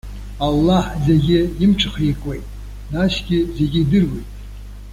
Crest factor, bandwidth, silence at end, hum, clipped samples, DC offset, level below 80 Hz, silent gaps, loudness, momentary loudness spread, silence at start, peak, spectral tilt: 14 dB; 15.5 kHz; 0 s; 50 Hz at -30 dBFS; under 0.1%; under 0.1%; -30 dBFS; none; -18 LUFS; 20 LU; 0.05 s; -4 dBFS; -7 dB/octave